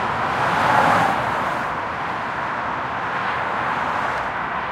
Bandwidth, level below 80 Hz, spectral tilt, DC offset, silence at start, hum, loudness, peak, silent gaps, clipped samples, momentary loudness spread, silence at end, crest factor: 16 kHz; -50 dBFS; -5 dB/octave; under 0.1%; 0 s; none; -21 LUFS; -4 dBFS; none; under 0.1%; 8 LU; 0 s; 18 dB